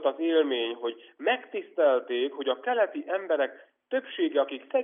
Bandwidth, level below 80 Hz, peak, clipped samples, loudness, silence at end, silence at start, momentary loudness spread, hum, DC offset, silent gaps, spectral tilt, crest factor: 3.8 kHz; under -90 dBFS; -12 dBFS; under 0.1%; -28 LUFS; 0 s; 0 s; 8 LU; none; under 0.1%; none; 1 dB/octave; 16 dB